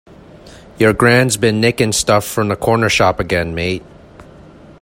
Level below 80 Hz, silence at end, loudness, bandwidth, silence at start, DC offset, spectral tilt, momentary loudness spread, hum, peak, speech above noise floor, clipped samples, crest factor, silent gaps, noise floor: -40 dBFS; 0.6 s; -14 LUFS; 16.5 kHz; 0.45 s; under 0.1%; -4.5 dB/octave; 8 LU; none; 0 dBFS; 26 dB; under 0.1%; 16 dB; none; -40 dBFS